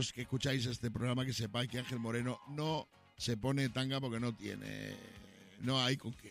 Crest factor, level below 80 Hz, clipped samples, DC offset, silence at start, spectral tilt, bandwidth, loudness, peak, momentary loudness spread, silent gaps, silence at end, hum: 18 dB; -64 dBFS; under 0.1%; under 0.1%; 0 s; -5 dB/octave; 15.5 kHz; -38 LUFS; -20 dBFS; 11 LU; none; 0 s; none